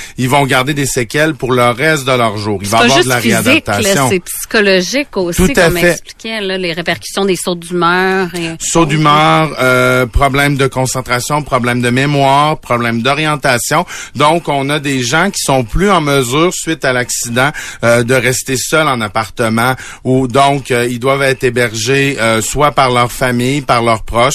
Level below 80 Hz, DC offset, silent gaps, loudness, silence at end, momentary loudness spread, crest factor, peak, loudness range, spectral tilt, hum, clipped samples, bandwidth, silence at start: -30 dBFS; under 0.1%; none; -12 LUFS; 0 s; 6 LU; 12 dB; 0 dBFS; 2 LU; -4 dB/octave; none; under 0.1%; 14 kHz; 0 s